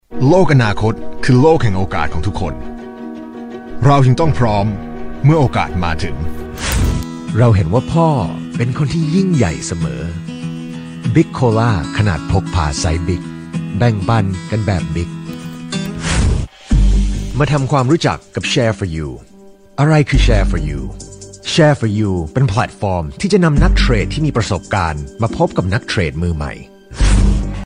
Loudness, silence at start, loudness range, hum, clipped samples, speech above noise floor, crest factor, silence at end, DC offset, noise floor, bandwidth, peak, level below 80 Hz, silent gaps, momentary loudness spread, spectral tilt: -16 LUFS; 0.1 s; 3 LU; none; under 0.1%; 27 dB; 14 dB; 0 s; under 0.1%; -41 dBFS; 16 kHz; 0 dBFS; -22 dBFS; none; 14 LU; -6.5 dB/octave